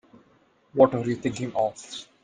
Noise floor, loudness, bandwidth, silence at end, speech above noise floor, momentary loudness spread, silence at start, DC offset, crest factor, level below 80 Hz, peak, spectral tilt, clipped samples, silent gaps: -62 dBFS; -25 LUFS; 9.6 kHz; 0.2 s; 37 dB; 16 LU; 0.75 s; under 0.1%; 24 dB; -62 dBFS; -2 dBFS; -6 dB/octave; under 0.1%; none